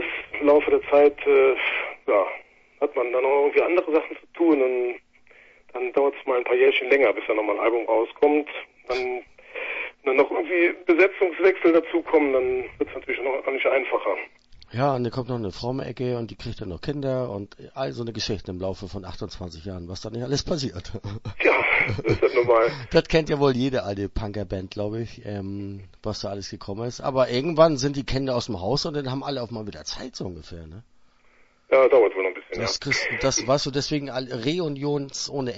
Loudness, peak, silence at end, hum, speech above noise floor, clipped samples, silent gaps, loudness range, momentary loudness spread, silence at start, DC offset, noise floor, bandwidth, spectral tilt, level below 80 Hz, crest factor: -23 LUFS; -4 dBFS; 0 s; none; 36 dB; under 0.1%; none; 9 LU; 16 LU; 0 s; under 0.1%; -59 dBFS; 8 kHz; -5 dB/octave; -48 dBFS; 20 dB